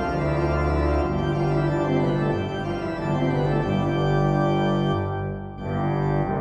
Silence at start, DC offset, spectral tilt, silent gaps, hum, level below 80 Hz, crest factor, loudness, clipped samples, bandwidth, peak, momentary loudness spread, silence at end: 0 s; under 0.1%; -8.5 dB/octave; none; none; -34 dBFS; 12 dB; -24 LUFS; under 0.1%; 7.4 kHz; -10 dBFS; 6 LU; 0 s